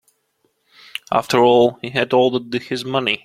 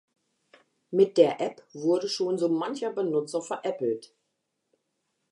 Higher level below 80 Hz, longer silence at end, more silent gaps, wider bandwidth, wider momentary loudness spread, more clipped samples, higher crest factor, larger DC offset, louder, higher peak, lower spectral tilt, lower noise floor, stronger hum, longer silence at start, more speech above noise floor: first, -60 dBFS vs -86 dBFS; second, 0.1 s vs 1.25 s; neither; first, 15 kHz vs 11 kHz; about the same, 11 LU vs 10 LU; neither; about the same, 18 dB vs 22 dB; neither; first, -17 LUFS vs -27 LUFS; first, -2 dBFS vs -6 dBFS; about the same, -5 dB/octave vs -5.5 dB/octave; second, -66 dBFS vs -80 dBFS; neither; first, 1.1 s vs 0.9 s; about the same, 50 dB vs 53 dB